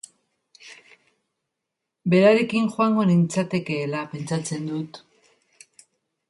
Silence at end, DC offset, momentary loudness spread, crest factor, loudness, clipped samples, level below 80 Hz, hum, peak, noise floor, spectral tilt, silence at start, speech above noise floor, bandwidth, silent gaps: 1.3 s; under 0.1%; 13 LU; 20 dB; -22 LUFS; under 0.1%; -68 dBFS; none; -4 dBFS; -83 dBFS; -6.5 dB/octave; 0.65 s; 61 dB; 11.5 kHz; none